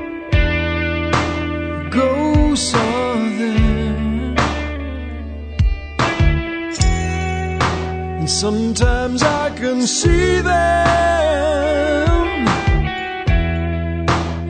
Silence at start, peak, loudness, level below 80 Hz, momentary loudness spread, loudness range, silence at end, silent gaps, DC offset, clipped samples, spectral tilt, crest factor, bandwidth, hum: 0 s; 0 dBFS; -17 LUFS; -24 dBFS; 7 LU; 4 LU; 0 s; none; under 0.1%; under 0.1%; -5 dB/octave; 16 dB; 9.4 kHz; none